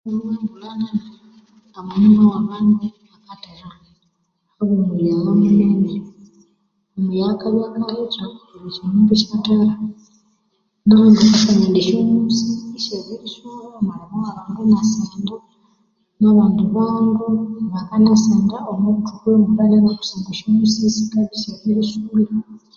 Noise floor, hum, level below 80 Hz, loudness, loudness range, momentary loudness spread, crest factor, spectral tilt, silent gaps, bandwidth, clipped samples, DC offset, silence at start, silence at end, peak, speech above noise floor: -68 dBFS; none; -54 dBFS; -17 LUFS; 6 LU; 15 LU; 16 dB; -6.5 dB/octave; none; 7.2 kHz; under 0.1%; under 0.1%; 0.05 s; 0.2 s; -2 dBFS; 52 dB